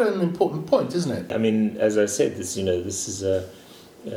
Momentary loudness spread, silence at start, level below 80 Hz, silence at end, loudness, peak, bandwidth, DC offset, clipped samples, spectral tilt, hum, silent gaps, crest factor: 6 LU; 0 s; -60 dBFS; 0 s; -24 LUFS; -6 dBFS; 16.5 kHz; under 0.1%; under 0.1%; -5 dB/octave; none; none; 18 dB